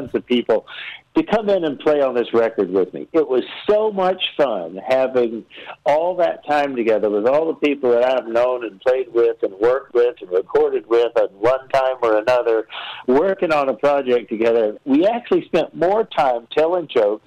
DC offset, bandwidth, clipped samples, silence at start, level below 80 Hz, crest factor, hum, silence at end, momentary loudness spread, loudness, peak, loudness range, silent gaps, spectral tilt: under 0.1%; 9 kHz; under 0.1%; 0 s; -58 dBFS; 10 dB; none; 0.1 s; 4 LU; -19 LUFS; -10 dBFS; 1 LU; none; -6 dB/octave